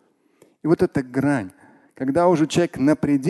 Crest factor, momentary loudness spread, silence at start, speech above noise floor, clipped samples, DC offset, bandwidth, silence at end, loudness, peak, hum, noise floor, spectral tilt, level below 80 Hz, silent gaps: 16 dB; 10 LU; 0.65 s; 38 dB; under 0.1%; under 0.1%; 12.5 kHz; 0 s; -21 LUFS; -4 dBFS; none; -58 dBFS; -6.5 dB/octave; -54 dBFS; none